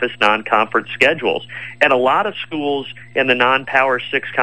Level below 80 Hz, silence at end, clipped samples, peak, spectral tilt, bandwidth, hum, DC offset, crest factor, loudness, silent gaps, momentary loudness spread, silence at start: -60 dBFS; 0 s; under 0.1%; 0 dBFS; -4.5 dB/octave; 12 kHz; none; 0.6%; 16 dB; -16 LUFS; none; 9 LU; 0 s